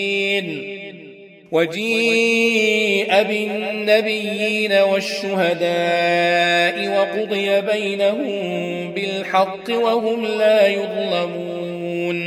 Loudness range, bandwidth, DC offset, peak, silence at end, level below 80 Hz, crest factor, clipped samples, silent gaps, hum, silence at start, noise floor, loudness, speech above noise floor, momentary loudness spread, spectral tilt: 3 LU; 15.5 kHz; under 0.1%; -2 dBFS; 0 s; -70 dBFS; 18 dB; under 0.1%; none; none; 0 s; -41 dBFS; -18 LUFS; 23 dB; 9 LU; -4 dB/octave